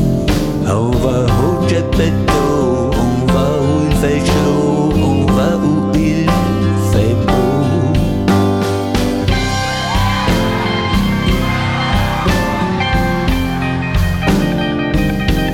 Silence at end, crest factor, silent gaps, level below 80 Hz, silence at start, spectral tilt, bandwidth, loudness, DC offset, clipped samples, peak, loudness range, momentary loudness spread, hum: 0 s; 12 dB; none; -24 dBFS; 0 s; -6.5 dB/octave; 17.5 kHz; -14 LUFS; under 0.1%; under 0.1%; -2 dBFS; 2 LU; 3 LU; none